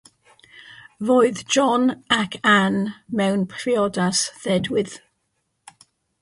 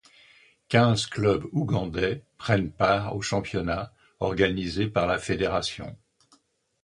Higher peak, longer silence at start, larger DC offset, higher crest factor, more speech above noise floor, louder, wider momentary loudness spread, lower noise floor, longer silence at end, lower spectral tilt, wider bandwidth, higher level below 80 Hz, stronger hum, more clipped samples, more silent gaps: about the same, -4 dBFS vs -4 dBFS; about the same, 0.6 s vs 0.7 s; neither; about the same, 18 dB vs 22 dB; first, 53 dB vs 39 dB; first, -20 LUFS vs -26 LUFS; about the same, 8 LU vs 9 LU; first, -73 dBFS vs -64 dBFS; first, 1.25 s vs 0.9 s; second, -4 dB/octave vs -5.5 dB/octave; about the same, 11.5 kHz vs 11 kHz; second, -60 dBFS vs -48 dBFS; neither; neither; neither